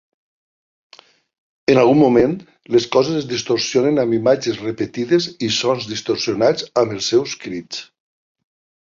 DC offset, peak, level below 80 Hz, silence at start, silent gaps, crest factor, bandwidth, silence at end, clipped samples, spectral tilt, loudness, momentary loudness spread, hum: under 0.1%; -2 dBFS; -56 dBFS; 1.7 s; none; 16 dB; 7.6 kHz; 1 s; under 0.1%; -5 dB/octave; -18 LUFS; 12 LU; none